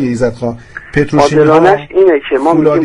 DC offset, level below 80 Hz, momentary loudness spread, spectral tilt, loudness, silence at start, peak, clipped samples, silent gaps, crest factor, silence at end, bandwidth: under 0.1%; -36 dBFS; 12 LU; -6.5 dB/octave; -10 LUFS; 0 s; 0 dBFS; 0.4%; none; 10 dB; 0 s; 10.5 kHz